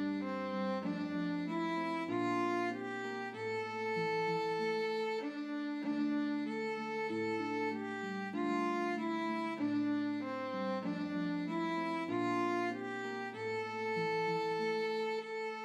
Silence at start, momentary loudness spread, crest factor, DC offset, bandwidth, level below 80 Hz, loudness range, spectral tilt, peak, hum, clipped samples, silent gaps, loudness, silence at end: 0 s; 5 LU; 12 dB; under 0.1%; 11.5 kHz; -86 dBFS; 1 LU; -6 dB/octave; -24 dBFS; none; under 0.1%; none; -37 LUFS; 0 s